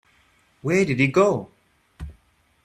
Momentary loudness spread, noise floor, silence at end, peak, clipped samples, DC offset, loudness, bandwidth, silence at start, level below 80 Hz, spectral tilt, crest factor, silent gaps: 23 LU; -61 dBFS; 0.55 s; -4 dBFS; under 0.1%; under 0.1%; -21 LUFS; 12.5 kHz; 0.65 s; -50 dBFS; -6.5 dB/octave; 20 dB; none